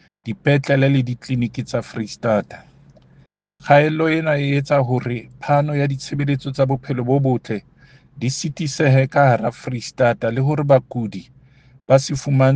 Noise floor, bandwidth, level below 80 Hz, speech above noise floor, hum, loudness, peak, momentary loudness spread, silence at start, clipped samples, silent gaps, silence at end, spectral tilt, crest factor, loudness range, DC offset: -53 dBFS; 9.2 kHz; -54 dBFS; 35 dB; none; -19 LUFS; 0 dBFS; 12 LU; 0.25 s; under 0.1%; none; 0 s; -6.5 dB/octave; 18 dB; 3 LU; under 0.1%